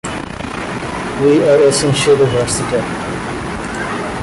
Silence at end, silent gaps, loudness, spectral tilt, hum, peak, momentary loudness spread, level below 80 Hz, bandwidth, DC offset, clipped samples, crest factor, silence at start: 0 s; none; -15 LUFS; -4.5 dB/octave; none; -2 dBFS; 12 LU; -38 dBFS; 11.5 kHz; under 0.1%; under 0.1%; 12 dB; 0.05 s